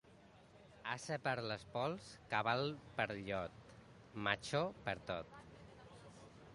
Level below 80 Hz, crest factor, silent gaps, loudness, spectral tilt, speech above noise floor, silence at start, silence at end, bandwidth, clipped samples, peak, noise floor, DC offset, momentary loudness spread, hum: -70 dBFS; 26 dB; none; -42 LUFS; -5 dB/octave; 22 dB; 0.05 s; 0 s; 11.5 kHz; under 0.1%; -18 dBFS; -64 dBFS; under 0.1%; 21 LU; none